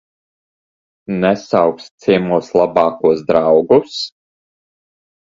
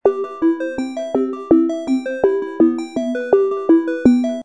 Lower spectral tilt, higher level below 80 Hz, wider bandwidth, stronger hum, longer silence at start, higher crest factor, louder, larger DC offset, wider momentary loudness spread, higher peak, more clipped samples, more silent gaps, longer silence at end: about the same, -6.5 dB/octave vs -6.5 dB/octave; about the same, -54 dBFS vs -52 dBFS; second, 7.8 kHz vs 9.2 kHz; neither; first, 1.1 s vs 0.05 s; about the same, 16 dB vs 14 dB; first, -15 LUFS vs -18 LUFS; second, under 0.1% vs 0.2%; first, 11 LU vs 7 LU; about the same, 0 dBFS vs -2 dBFS; neither; first, 1.91-1.98 s vs none; first, 1.15 s vs 0 s